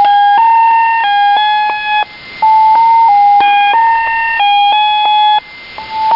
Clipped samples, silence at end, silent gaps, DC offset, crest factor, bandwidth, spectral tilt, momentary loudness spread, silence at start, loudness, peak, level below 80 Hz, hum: under 0.1%; 0 s; none; under 0.1%; 8 dB; 5.6 kHz; -2.5 dB/octave; 8 LU; 0 s; -9 LUFS; -2 dBFS; -50 dBFS; none